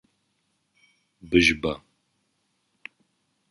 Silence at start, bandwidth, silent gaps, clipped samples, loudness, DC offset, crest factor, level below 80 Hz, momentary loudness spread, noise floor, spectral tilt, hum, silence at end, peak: 1.25 s; 11.5 kHz; none; under 0.1%; -22 LUFS; under 0.1%; 24 dB; -50 dBFS; 26 LU; -73 dBFS; -4 dB/octave; none; 1.75 s; -6 dBFS